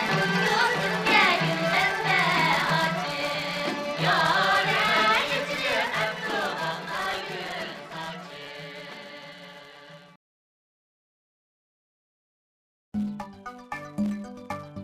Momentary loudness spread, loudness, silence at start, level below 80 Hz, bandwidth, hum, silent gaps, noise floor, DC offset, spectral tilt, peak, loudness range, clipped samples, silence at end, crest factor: 18 LU; -24 LUFS; 0 s; -62 dBFS; 15.5 kHz; none; 10.16-12.92 s; -48 dBFS; under 0.1%; -4 dB/octave; -8 dBFS; 19 LU; under 0.1%; 0 s; 20 dB